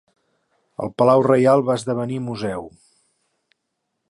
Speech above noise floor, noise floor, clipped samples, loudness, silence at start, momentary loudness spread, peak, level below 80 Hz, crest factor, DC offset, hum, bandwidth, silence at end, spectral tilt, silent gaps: 58 dB; -76 dBFS; under 0.1%; -19 LUFS; 0.8 s; 16 LU; -4 dBFS; -60 dBFS; 18 dB; under 0.1%; none; 11.5 kHz; 1.4 s; -7 dB/octave; none